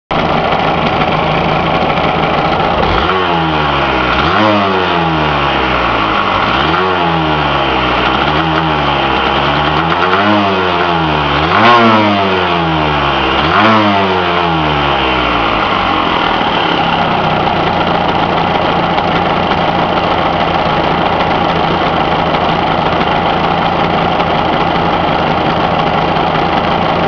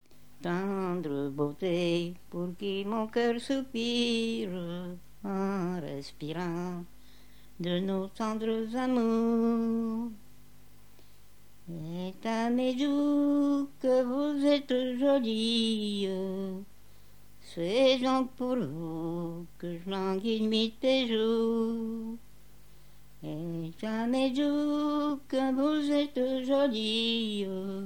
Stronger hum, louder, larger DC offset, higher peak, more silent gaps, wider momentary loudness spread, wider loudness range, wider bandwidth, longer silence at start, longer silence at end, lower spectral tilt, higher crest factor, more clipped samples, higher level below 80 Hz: second, none vs 50 Hz at -60 dBFS; first, -11 LUFS vs -30 LUFS; about the same, 0.4% vs 0.4%; first, 0 dBFS vs -14 dBFS; neither; second, 2 LU vs 12 LU; second, 2 LU vs 6 LU; second, 5.4 kHz vs 18 kHz; about the same, 0.1 s vs 0 s; about the same, 0 s vs 0 s; about the same, -6.5 dB/octave vs -6 dB/octave; about the same, 12 dB vs 16 dB; neither; first, -30 dBFS vs -62 dBFS